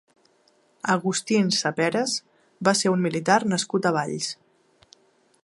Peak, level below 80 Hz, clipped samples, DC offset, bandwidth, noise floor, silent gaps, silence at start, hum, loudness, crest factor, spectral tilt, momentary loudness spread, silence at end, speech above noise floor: -4 dBFS; -70 dBFS; under 0.1%; under 0.1%; 11.5 kHz; -63 dBFS; none; 0.85 s; none; -23 LUFS; 22 dB; -4 dB/octave; 9 LU; 1.1 s; 40 dB